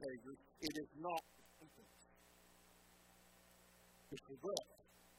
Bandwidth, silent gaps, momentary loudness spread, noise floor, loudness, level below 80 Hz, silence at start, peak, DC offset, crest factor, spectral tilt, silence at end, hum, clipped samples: 16.5 kHz; none; 22 LU; -69 dBFS; -48 LUFS; -78 dBFS; 0 s; -20 dBFS; under 0.1%; 32 dB; -3.5 dB/octave; 0 s; 60 Hz at -75 dBFS; under 0.1%